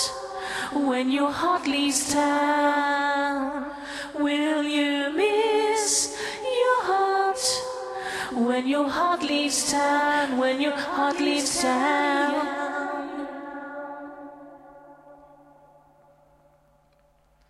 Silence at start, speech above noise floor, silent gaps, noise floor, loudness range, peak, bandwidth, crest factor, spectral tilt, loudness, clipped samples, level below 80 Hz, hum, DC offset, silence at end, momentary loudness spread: 0 s; 38 dB; none; -62 dBFS; 10 LU; -10 dBFS; 14 kHz; 16 dB; -1.5 dB/octave; -24 LUFS; under 0.1%; -62 dBFS; none; under 0.1%; 2.35 s; 12 LU